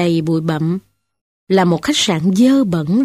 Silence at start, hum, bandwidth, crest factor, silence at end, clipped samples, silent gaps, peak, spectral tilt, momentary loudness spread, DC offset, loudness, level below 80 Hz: 0 s; none; 15 kHz; 14 dB; 0 s; under 0.1%; 1.21-1.47 s; -2 dBFS; -5.5 dB/octave; 7 LU; under 0.1%; -15 LUFS; -52 dBFS